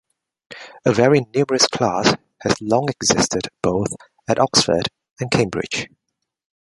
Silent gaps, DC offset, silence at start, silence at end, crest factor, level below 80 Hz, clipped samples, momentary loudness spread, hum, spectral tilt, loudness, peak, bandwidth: 5.11-5.16 s; under 0.1%; 0.5 s; 0.85 s; 20 dB; -50 dBFS; under 0.1%; 12 LU; none; -3.5 dB/octave; -19 LUFS; 0 dBFS; 11.5 kHz